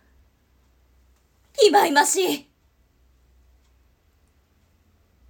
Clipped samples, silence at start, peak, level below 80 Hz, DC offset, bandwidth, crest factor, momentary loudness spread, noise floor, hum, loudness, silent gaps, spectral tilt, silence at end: under 0.1%; 1.6 s; -4 dBFS; -62 dBFS; under 0.1%; 18 kHz; 22 dB; 14 LU; -62 dBFS; none; -19 LUFS; none; -1 dB/octave; 2.9 s